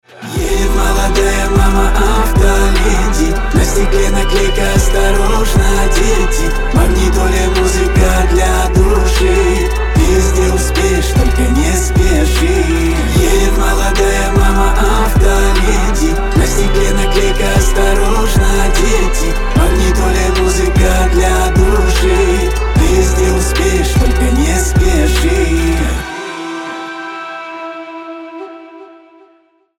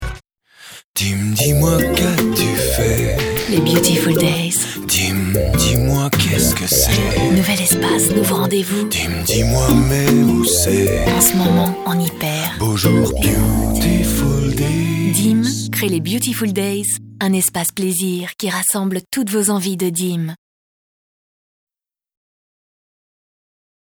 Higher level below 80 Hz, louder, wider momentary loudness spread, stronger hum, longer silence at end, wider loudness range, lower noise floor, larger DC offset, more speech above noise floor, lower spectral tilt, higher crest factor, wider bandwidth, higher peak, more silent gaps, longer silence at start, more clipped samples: first, -12 dBFS vs -30 dBFS; first, -13 LUFS vs -16 LUFS; about the same, 6 LU vs 6 LU; neither; second, 0.95 s vs 3.65 s; second, 2 LU vs 6 LU; first, -52 dBFS vs -42 dBFS; neither; first, 42 dB vs 26 dB; about the same, -5 dB/octave vs -4.5 dB/octave; second, 10 dB vs 16 dB; second, 16.5 kHz vs over 20 kHz; about the same, 0 dBFS vs 0 dBFS; second, none vs 0.84-0.94 s; first, 0.2 s vs 0 s; neither